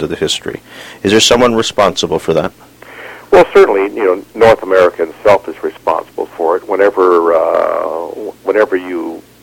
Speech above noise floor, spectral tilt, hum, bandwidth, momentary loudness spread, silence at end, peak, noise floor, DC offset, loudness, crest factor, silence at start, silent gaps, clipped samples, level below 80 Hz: 20 dB; -3.5 dB/octave; none; 17 kHz; 15 LU; 0.25 s; 0 dBFS; -32 dBFS; under 0.1%; -12 LUFS; 12 dB; 0 s; none; 0.3%; -42 dBFS